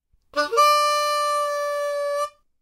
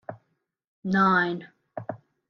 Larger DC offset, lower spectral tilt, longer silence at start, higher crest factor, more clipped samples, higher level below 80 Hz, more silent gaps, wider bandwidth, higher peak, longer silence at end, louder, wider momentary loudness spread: neither; second, 1 dB/octave vs -7.5 dB/octave; first, 0.35 s vs 0.1 s; about the same, 16 dB vs 20 dB; neither; about the same, -68 dBFS vs -66 dBFS; second, none vs 0.67-0.83 s; first, 16 kHz vs 6.4 kHz; about the same, -8 dBFS vs -8 dBFS; about the same, 0.35 s vs 0.35 s; about the same, -21 LUFS vs -23 LUFS; second, 11 LU vs 20 LU